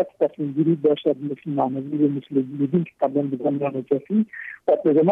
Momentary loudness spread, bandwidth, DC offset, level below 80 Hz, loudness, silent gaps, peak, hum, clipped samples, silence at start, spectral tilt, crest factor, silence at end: 6 LU; 3.8 kHz; under 0.1%; -72 dBFS; -23 LUFS; none; -8 dBFS; none; under 0.1%; 0 s; -10.5 dB/octave; 14 dB; 0 s